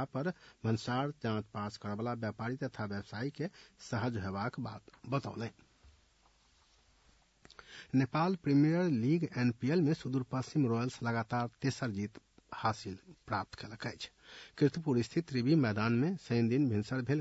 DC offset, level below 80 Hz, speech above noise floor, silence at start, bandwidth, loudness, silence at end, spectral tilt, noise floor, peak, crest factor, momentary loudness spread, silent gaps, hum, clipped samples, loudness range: under 0.1%; -70 dBFS; 35 dB; 0 s; 8 kHz; -35 LUFS; 0 s; -7 dB/octave; -69 dBFS; -16 dBFS; 18 dB; 14 LU; none; none; under 0.1%; 9 LU